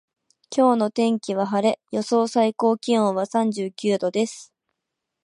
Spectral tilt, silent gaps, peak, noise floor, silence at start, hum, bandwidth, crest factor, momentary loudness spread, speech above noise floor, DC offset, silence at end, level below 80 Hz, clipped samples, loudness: -5.5 dB/octave; none; -6 dBFS; -82 dBFS; 0.5 s; none; 11 kHz; 16 dB; 7 LU; 61 dB; under 0.1%; 0.8 s; -76 dBFS; under 0.1%; -22 LUFS